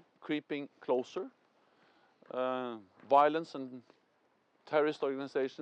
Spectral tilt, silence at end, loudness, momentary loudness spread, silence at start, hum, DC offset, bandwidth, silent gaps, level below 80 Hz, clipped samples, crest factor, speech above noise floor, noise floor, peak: -6 dB/octave; 0 s; -34 LUFS; 18 LU; 0.2 s; none; under 0.1%; 8.6 kHz; none; under -90 dBFS; under 0.1%; 22 dB; 40 dB; -73 dBFS; -12 dBFS